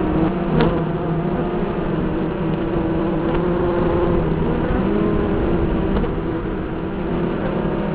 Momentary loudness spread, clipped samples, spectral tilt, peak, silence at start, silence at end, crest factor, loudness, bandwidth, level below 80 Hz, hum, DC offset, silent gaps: 5 LU; under 0.1%; -12 dB/octave; 0 dBFS; 0 s; 0 s; 18 dB; -20 LUFS; 4 kHz; -28 dBFS; none; 0.4%; none